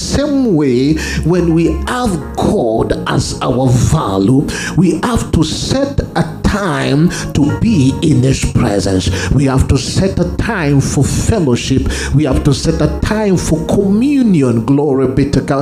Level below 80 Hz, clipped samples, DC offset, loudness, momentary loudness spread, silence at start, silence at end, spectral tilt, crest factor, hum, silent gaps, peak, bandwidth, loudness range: -26 dBFS; under 0.1%; under 0.1%; -13 LUFS; 4 LU; 0 s; 0 s; -6 dB/octave; 12 dB; none; none; 0 dBFS; 15 kHz; 1 LU